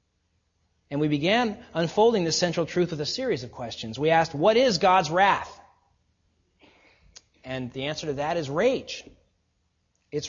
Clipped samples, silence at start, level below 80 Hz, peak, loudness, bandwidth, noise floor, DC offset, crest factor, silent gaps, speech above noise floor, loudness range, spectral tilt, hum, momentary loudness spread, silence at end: under 0.1%; 0.9 s; -58 dBFS; -6 dBFS; -24 LUFS; 7.6 kHz; -72 dBFS; under 0.1%; 20 dB; none; 48 dB; 7 LU; -4.5 dB/octave; none; 14 LU; 0 s